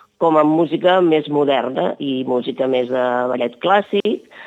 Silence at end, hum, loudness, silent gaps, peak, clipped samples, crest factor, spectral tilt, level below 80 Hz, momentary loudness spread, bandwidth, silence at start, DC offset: 0 s; none; -17 LUFS; none; -2 dBFS; under 0.1%; 16 dB; -7.5 dB/octave; -76 dBFS; 7 LU; 8 kHz; 0.2 s; under 0.1%